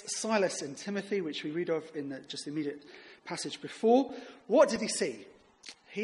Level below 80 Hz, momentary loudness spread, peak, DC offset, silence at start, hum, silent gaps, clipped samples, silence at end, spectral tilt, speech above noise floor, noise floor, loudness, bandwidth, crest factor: -78 dBFS; 21 LU; -12 dBFS; under 0.1%; 0 s; none; none; under 0.1%; 0 s; -3.5 dB/octave; 22 dB; -54 dBFS; -32 LUFS; 11.5 kHz; 22 dB